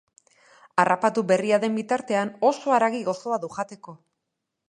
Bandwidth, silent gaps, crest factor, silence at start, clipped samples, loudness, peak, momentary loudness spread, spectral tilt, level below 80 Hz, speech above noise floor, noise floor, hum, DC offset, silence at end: 10.5 kHz; none; 22 dB; 0.75 s; under 0.1%; -24 LUFS; -4 dBFS; 10 LU; -5 dB/octave; -74 dBFS; 58 dB; -82 dBFS; none; under 0.1%; 0.75 s